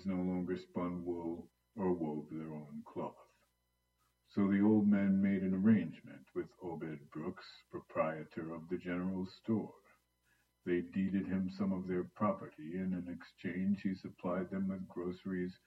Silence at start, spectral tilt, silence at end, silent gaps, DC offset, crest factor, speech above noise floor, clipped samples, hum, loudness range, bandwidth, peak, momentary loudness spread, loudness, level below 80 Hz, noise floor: 0 s; -9.5 dB/octave; 0.15 s; none; under 0.1%; 18 dB; 45 dB; under 0.1%; 60 Hz at -65 dBFS; 8 LU; 5.8 kHz; -18 dBFS; 15 LU; -38 LUFS; -74 dBFS; -81 dBFS